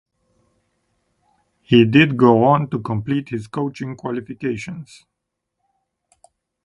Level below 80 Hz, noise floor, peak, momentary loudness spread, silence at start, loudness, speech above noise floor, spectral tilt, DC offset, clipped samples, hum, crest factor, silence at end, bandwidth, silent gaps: -56 dBFS; -79 dBFS; 0 dBFS; 15 LU; 1.7 s; -18 LUFS; 61 dB; -7.5 dB/octave; under 0.1%; under 0.1%; none; 20 dB; 1.8 s; 10.5 kHz; none